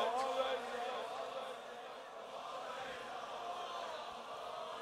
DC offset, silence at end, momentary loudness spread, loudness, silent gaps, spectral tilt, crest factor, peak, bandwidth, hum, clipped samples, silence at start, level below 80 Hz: under 0.1%; 0 s; 11 LU; -43 LUFS; none; -2 dB/octave; 18 dB; -24 dBFS; 16 kHz; none; under 0.1%; 0 s; -80 dBFS